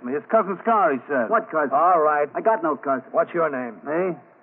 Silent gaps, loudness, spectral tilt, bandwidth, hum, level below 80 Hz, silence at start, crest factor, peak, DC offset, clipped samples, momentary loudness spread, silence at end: none; -22 LUFS; -5.5 dB/octave; 3.5 kHz; none; -84 dBFS; 0 s; 14 dB; -6 dBFS; under 0.1%; under 0.1%; 7 LU; 0.2 s